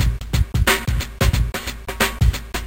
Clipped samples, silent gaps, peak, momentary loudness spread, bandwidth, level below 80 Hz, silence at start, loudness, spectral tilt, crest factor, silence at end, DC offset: under 0.1%; none; -2 dBFS; 7 LU; 17 kHz; -22 dBFS; 0 s; -20 LUFS; -4 dB/octave; 18 dB; 0 s; 0.4%